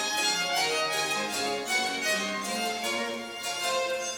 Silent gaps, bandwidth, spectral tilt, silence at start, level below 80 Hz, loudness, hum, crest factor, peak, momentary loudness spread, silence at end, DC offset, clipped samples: none; over 20 kHz; -1 dB/octave; 0 s; -70 dBFS; -28 LUFS; none; 16 dB; -14 dBFS; 5 LU; 0 s; under 0.1%; under 0.1%